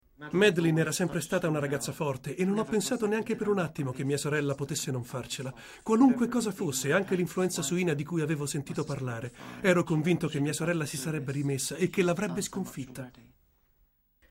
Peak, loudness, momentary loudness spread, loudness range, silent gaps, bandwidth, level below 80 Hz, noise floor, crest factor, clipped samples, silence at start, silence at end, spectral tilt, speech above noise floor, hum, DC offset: -12 dBFS; -29 LUFS; 11 LU; 3 LU; none; 16 kHz; -62 dBFS; -69 dBFS; 18 dB; under 0.1%; 0.2 s; 1.2 s; -5 dB/octave; 40 dB; none; under 0.1%